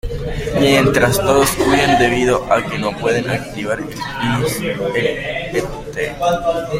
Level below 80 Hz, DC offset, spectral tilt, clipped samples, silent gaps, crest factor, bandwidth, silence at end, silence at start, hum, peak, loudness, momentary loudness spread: -34 dBFS; under 0.1%; -4.5 dB/octave; under 0.1%; none; 16 dB; 16.5 kHz; 0 s; 0.05 s; none; 0 dBFS; -17 LUFS; 10 LU